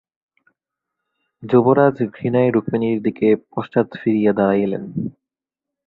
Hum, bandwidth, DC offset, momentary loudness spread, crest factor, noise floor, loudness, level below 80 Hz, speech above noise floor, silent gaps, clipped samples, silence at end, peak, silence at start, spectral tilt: none; 4.6 kHz; under 0.1%; 11 LU; 18 dB; -86 dBFS; -18 LUFS; -58 dBFS; 69 dB; none; under 0.1%; 0.75 s; -2 dBFS; 1.4 s; -11 dB/octave